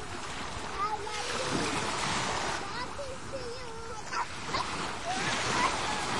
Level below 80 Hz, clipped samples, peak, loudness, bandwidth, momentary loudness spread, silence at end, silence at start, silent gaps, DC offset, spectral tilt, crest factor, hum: -52 dBFS; under 0.1%; -16 dBFS; -33 LUFS; 11.5 kHz; 10 LU; 0 s; 0 s; none; 0.7%; -2.5 dB/octave; 18 dB; none